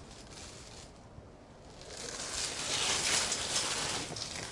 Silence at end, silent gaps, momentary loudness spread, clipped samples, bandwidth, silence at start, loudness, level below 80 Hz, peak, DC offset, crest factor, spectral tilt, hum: 0 s; none; 24 LU; under 0.1%; 11.5 kHz; 0 s; -32 LUFS; -58 dBFS; -14 dBFS; under 0.1%; 22 dB; -0.5 dB/octave; none